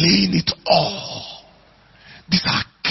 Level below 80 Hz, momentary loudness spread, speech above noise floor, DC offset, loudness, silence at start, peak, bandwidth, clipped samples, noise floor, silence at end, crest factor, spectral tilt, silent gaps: -48 dBFS; 16 LU; 34 dB; under 0.1%; -19 LUFS; 0 s; -2 dBFS; 6 kHz; under 0.1%; -51 dBFS; 0 s; 20 dB; -5 dB/octave; none